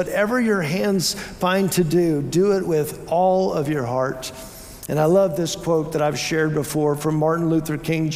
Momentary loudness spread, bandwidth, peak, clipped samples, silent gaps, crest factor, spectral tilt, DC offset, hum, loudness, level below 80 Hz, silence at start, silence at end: 6 LU; 16 kHz; -6 dBFS; under 0.1%; none; 14 dB; -5.5 dB/octave; under 0.1%; none; -21 LUFS; -50 dBFS; 0 s; 0 s